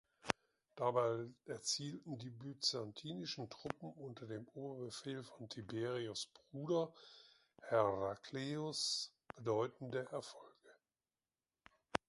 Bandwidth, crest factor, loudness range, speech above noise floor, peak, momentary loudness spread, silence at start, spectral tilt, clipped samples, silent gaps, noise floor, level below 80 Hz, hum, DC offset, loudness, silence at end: 11.5 kHz; 34 dB; 6 LU; over 47 dB; -10 dBFS; 13 LU; 0.25 s; -4 dB/octave; under 0.1%; none; under -90 dBFS; -78 dBFS; none; under 0.1%; -43 LUFS; 0.1 s